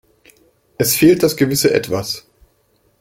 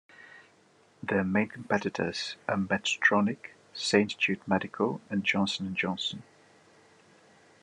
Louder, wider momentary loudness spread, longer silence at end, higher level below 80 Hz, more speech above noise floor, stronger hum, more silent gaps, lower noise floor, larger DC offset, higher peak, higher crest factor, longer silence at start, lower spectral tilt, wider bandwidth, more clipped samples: first, -15 LUFS vs -29 LUFS; first, 12 LU vs 9 LU; second, 0.8 s vs 1.4 s; first, -50 dBFS vs -76 dBFS; first, 45 dB vs 33 dB; neither; neither; about the same, -60 dBFS vs -62 dBFS; neither; first, -2 dBFS vs -8 dBFS; second, 16 dB vs 22 dB; first, 0.8 s vs 0.2 s; about the same, -4.5 dB/octave vs -4.5 dB/octave; first, 16.5 kHz vs 10.5 kHz; neither